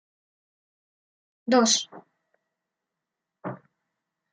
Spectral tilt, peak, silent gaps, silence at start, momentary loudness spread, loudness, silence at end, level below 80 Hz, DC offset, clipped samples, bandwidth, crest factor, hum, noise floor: -2 dB/octave; -6 dBFS; none; 1.45 s; 20 LU; -22 LUFS; 0.75 s; -82 dBFS; under 0.1%; under 0.1%; 9.4 kHz; 24 dB; none; -86 dBFS